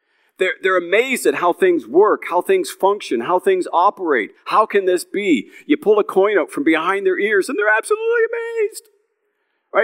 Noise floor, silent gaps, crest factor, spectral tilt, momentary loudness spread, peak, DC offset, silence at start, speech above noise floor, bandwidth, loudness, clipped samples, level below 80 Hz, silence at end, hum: -69 dBFS; none; 16 dB; -4 dB/octave; 6 LU; -2 dBFS; under 0.1%; 0.4 s; 52 dB; 16 kHz; -17 LUFS; under 0.1%; -88 dBFS; 0 s; none